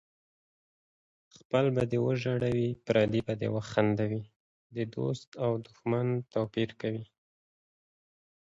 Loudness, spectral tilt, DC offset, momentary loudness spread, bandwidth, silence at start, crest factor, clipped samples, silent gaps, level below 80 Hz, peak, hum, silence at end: -31 LUFS; -7.5 dB/octave; under 0.1%; 9 LU; 7.8 kHz; 1.55 s; 22 dB; under 0.1%; 4.36-4.70 s, 5.27-5.32 s; -62 dBFS; -10 dBFS; none; 1.4 s